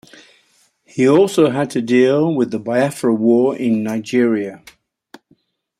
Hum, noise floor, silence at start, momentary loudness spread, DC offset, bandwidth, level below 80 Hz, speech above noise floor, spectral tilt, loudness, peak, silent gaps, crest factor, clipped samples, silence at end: none; -59 dBFS; 0.95 s; 7 LU; under 0.1%; 14.5 kHz; -64 dBFS; 43 dB; -6.5 dB/octave; -16 LUFS; -2 dBFS; none; 16 dB; under 0.1%; 1.25 s